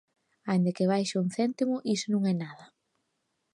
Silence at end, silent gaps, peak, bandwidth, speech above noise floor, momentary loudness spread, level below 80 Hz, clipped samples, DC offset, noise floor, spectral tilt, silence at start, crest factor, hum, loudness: 0.9 s; none; -16 dBFS; 11 kHz; 51 dB; 6 LU; -78 dBFS; under 0.1%; under 0.1%; -79 dBFS; -6 dB/octave; 0.45 s; 14 dB; none; -29 LUFS